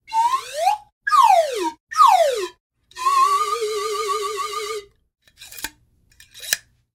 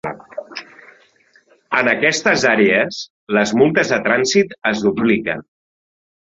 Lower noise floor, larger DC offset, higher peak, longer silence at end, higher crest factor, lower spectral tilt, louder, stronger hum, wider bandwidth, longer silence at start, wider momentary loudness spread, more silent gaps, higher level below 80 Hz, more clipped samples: about the same, -57 dBFS vs -54 dBFS; neither; about the same, 0 dBFS vs -2 dBFS; second, 0.35 s vs 0.9 s; about the same, 20 dB vs 16 dB; second, 0 dB/octave vs -4 dB/octave; second, -19 LUFS vs -16 LUFS; neither; first, 17 kHz vs 8 kHz; about the same, 0.1 s vs 0.05 s; about the same, 18 LU vs 16 LU; first, 0.92-1.01 s, 1.80-1.87 s, 2.60-2.70 s vs 3.10-3.27 s; second, -62 dBFS vs -56 dBFS; neither